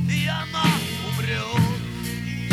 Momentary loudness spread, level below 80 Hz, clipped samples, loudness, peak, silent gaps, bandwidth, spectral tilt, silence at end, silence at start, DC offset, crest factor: 8 LU; -46 dBFS; under 0.1%; -24 LUFS; -4 dBFS; none; 16.5 kHz; -5 dB/octave; 0 s; 0 s; under 0.1%; 20 dB